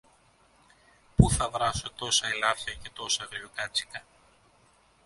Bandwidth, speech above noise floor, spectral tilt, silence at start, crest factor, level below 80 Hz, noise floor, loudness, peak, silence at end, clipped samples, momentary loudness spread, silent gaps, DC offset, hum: 11.5 kHz; 32 dB; -3.5 dB/octave; 1.2 s; 28 dB; -42 dBFS; -63 dBFS; -28 LUFS; -2 dBFS; 1.05 s; under 0.1%; 14 LU; none; under 0.1%; none